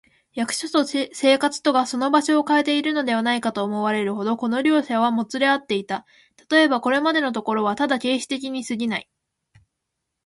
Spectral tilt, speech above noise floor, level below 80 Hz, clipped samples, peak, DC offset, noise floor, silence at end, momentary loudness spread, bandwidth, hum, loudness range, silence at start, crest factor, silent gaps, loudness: -3.5 dB/octave; 59 dB; -70 dBFS; under 0.1%; -4 dBFS; under 0.1%; -80 dBFS; 1.25 s; 8 LU; 11.5 kHz; none; 2 LU; 0.35 s; 18 dB; none; -21 LUFS